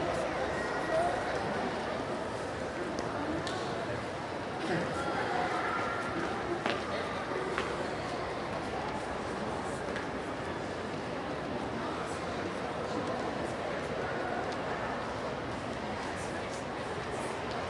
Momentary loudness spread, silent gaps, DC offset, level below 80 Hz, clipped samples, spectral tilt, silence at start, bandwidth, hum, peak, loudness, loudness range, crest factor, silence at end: 5 LU; none; under 0.1%; -56 dBFS; under 0.1%; -5 dB/octave; 0 s; 11.5 kHz; none; -12 dBFS; -35 LUFS; 3 LU; 22 dB; 0 s